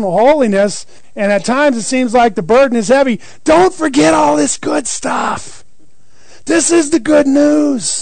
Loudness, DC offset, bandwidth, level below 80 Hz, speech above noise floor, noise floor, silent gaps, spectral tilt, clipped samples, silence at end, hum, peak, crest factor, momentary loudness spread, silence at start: -12 LUFS; 3%; 9.4 kHz; -44 dBFS; 41 dB; -53 dBFS; none; -4 dB/octave; under 0.1%; 0 s; none; -2 dBFS; 10 dB; 7 LU; 0 s